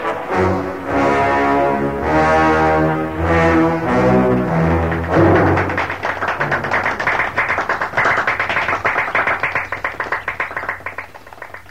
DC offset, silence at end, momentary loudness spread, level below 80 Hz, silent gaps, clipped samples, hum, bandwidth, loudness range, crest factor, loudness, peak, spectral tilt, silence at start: 0.7%; 0.1 s; 9 LU; -36 dBFS; none; under 0.1%; none; 15.5 kHz; 3 LU; 16 dB; -16 LUFS; -2 dBFS; -7 dB/octave; 0 s